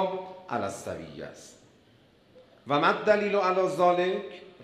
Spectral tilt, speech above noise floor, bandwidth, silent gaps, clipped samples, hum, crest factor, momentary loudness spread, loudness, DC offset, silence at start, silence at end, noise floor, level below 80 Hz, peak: -5 dB/octave; 33 dB; 13.5 kHz; none; under 0.1%; none; 20 dB; 18 LU; -27 LUFS; under 0.1%; 0 s; 0 s; -60 dBFS; -68 dBFS; -8 dBFS